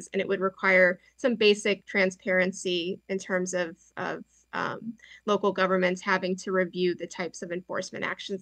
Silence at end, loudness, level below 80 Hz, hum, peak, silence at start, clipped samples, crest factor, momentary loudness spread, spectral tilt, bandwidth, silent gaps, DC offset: 0 s; -27 LUFS; -72 dBFS; none; -10 dBFS; 0 s; under 0.1%; 18 dB; 13 LU; -4.5 dB/octave; 10 kHz; none; under 0.1%